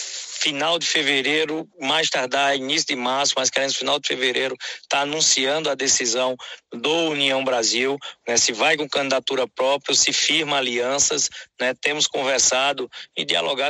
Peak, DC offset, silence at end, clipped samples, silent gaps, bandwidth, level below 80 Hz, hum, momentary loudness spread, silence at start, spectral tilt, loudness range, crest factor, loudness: -4 dBFS; under 0.1%; 0 s; under 0.1%; none; 16 kHz; -66 dBFS; none; 8 LU; 0 s; -0.5 dB/octave; 2 LU; 18 dB; -20 LUFS